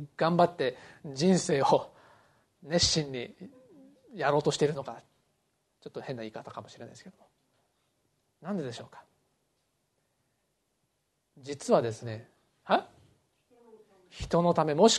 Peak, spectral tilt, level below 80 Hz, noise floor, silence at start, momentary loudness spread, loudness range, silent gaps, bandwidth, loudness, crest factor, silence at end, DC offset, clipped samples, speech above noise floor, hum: -8 dBFS; -4.5 dB/octave; -60 dBFS; -78 dBFS; 0 s; 23 LU; 15 LU; none; 12 kHz; -29 LUFS; 24 dB; 0 s; under 0.1%; under 0.1%; 49 dB; none